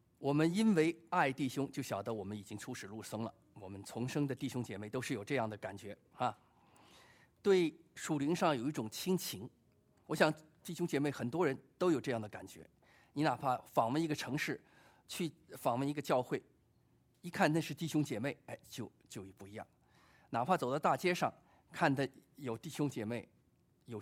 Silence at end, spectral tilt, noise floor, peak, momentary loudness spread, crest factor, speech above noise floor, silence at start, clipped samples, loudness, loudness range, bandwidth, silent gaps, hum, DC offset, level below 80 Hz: 0 s; -5.5 dB/octave; -72 dBFS; -14 dBFS; 16 LU; 24 dB; 36 dB; 0.2 s; under 0.1%; -37 LUFS; 4 LU; 16 kHz; none; none; under 0.1%; -76 dBFS